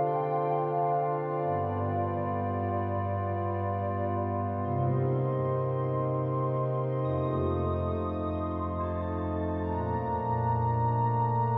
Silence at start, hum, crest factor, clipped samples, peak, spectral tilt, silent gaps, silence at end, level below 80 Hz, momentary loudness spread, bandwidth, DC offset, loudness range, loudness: 0 s; none; 12 dB; under 0.1%; -16 dBFS; -12 dB/octave; none; 0 s; -56 dBFS; 4 LU; 4 kHz; under 0.1%; 1 LU; -30 LUFS